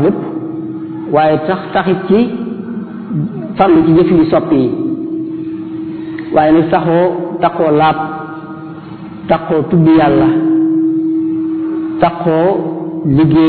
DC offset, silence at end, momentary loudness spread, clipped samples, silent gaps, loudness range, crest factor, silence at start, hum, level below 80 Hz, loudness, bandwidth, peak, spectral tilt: under 0.1%; 0 s; 14 LU; under 0.1%; none; 2 LU; 12 dB; 0 s; none; -42 dBFS; -13 LUFS; 4.5 kHz; 0 dBFS; -12 dB/octave